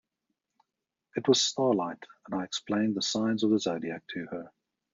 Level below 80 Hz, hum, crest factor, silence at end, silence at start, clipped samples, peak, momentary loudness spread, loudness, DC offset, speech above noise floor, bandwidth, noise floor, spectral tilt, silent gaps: -74 dBFS; none; 20 dB; 0.45 s; 1.15 s; under 0.1%; -10 dBFS; 14 LU; -29 LUFS; under 0.1%; 58 dB; 7.8 kHz; -87 dBFS; -4 dB/octave; none